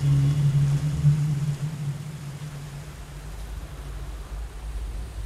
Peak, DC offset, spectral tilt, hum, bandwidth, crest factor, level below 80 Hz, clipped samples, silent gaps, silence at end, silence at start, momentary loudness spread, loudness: -10 dBFS; under 0.1%; -7.5 dB/octave; none; 12.5 kHz; 16 dB; -38 dBFS; under 0.1%; none; 0 s; 0 s; 17 LU; -26 LUFS